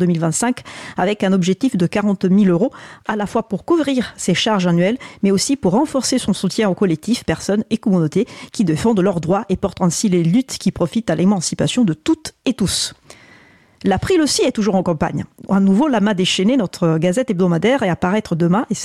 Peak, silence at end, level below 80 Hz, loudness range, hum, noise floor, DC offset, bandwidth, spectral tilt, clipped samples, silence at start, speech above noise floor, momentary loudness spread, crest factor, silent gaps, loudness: -6 dBFS; 0 s; -46 dBFS; 2 LU; none; -48 dBFS; under 0.1%; 13.5 kHz; -5.5 dB/octave; under 0.1%; 0 s; 32 dB; 6 LU; 10 dB; none; -17 LUFS